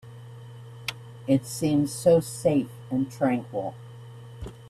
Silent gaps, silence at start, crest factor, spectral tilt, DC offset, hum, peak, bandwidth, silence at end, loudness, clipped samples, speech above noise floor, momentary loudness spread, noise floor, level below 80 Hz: none; 0.05 s; 18 dB; -6 dB/octave; under 0.1%; none; -8 dBFS; 15 kHz; 0 s; -26 LUFS; under 0.1%; 19 dB; 23 LU; -43 dBFS; -54 dBFS